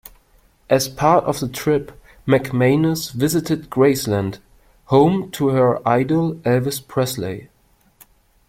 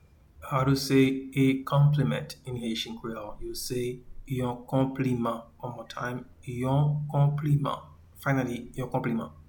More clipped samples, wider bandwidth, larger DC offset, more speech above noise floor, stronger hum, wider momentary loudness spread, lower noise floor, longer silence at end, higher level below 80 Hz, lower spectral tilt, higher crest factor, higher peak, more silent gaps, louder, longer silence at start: neither; second, 16.5 kHz vs 19 kHz; neither; first, 37 dB vs 20 dB; neither; second, 8 LU vs 14 LU; first, -55 dBFS vs -48 dBFS; first, 1.05 s vs 0.15 s; about the same, -50 dBFS vs -52 dBFS; about the same, -6 dB/octave vs -6.5 dB/octave; about the same, 18 dB vs 16 dB; first, -2 dBFS vs -12 dBFS; neither; first, -19 LUFS vs -28 LUFS; first, 0.7 s vs 0.4 s